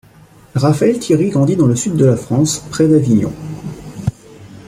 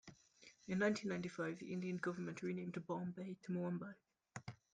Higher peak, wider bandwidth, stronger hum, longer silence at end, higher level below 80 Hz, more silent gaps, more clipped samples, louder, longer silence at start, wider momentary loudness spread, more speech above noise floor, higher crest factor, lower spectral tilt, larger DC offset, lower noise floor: first, -2 dBFS vs -26 dBFS; first, 15 kHz vs 9.4 kHz; neither; second, 0.05 s vs 0.2 s; first, -46 dBFS vs -80 dBFS; neither; neither; first, -14 LUFS vs -44 LUFS; first, 0.55 s vs 0.05 s; second, 12 LU vs 20 LU; first, 31 dB vs 24 dB; about the same, 14 dB vs 18 dB; about the same, -6.5 dB/octave vs -6.5 dB/octave; neither; second, -44 dBFS vs -67 dBFS